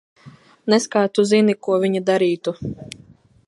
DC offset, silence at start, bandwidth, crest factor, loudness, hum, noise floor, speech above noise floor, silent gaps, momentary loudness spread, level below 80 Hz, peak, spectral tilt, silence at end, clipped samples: under 0.1%; 0.25 s; 11.5 kHz; 18 dB; -18 LUFS; none; -46 dBFS; 28 dB; none; 17 LU; -58 dBFS; -2 dBFS; -5 dB/octave; 0.65 s; under 0.1%